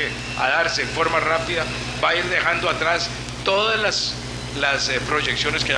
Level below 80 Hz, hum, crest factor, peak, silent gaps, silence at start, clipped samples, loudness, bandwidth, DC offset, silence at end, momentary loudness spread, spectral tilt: -42 dBFS; 60 Hz at -35 dBFS; 16 dB; -4 dBFS; none; 0 s; under 0.1%; -20 LUFS; 10.5 kHz; under 0.1%; 0 s; 6 LU; -3 dB/octave